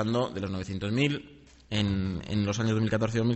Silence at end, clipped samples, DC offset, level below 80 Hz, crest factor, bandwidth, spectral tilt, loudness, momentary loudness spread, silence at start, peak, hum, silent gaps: 0 s; under 0.1%; under 0.1%; -52 dBFS; 18 dB; 8.2 kHz; -6 dB/octave; -29 LUFS; 7 LU; 0 s; -12 dBFS; none; none